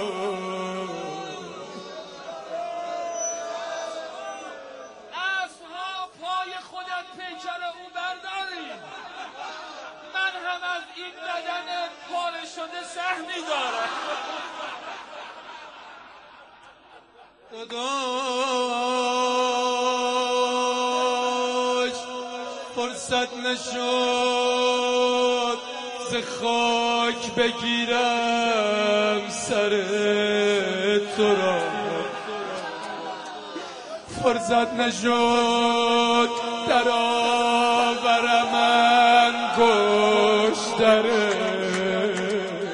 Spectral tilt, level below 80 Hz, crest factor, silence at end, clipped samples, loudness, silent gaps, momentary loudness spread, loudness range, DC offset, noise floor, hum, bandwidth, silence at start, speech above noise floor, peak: -3 dB/octave; -64 dBFS; 20 dB; 0 s; under 0.1%; -23 LUFS; none; 17 LU; 13 LU; under 0.1%; -52 dBFS; none; 11 kHz; 0 s; 30 dB; -6 dBFS